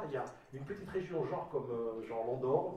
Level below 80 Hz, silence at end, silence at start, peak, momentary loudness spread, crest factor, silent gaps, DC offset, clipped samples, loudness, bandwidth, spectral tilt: -68 dBFS; 0 s; 0 s; -20 dBFS; 11 LU; 18 dB; none; under 0.1%; under 0.1%; -39 LUFS; 10 kHz; -8 dB/octave